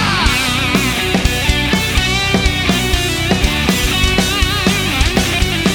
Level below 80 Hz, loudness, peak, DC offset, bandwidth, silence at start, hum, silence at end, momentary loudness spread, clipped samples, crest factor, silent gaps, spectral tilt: -20 dBFS; -14 LUFS; 0 dBFS; under 0.1%; over 20 kHz; 0 s; none; 0 s; 1 LU; under 0.1%; 14 dB; none; -3.5 dB/octave